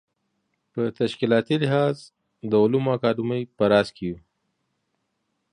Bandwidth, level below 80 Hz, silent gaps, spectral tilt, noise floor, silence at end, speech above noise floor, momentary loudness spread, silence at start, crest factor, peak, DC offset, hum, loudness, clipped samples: 10.5 kHz; -60 dBFS; none; -7.5 dB/octave; -75 dBFS; 1.35 s; 53 dB; 14 LU; 0.75 s; 20 dB; -4 dBFS; under 0.1%; none; -23 LUFS; under 0.1%